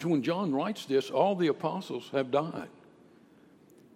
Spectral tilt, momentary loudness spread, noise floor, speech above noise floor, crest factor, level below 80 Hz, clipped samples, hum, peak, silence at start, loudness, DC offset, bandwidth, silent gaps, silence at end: -6.5 dB/octave; 11 LU; -59 dBFS; 29 dB; 20 dB; -82 dBFS; under 0.1%; none; -12 dBFS; 0 s; -30 LUFS; under 0.1%; 15.5 kHz; none; 1.25 s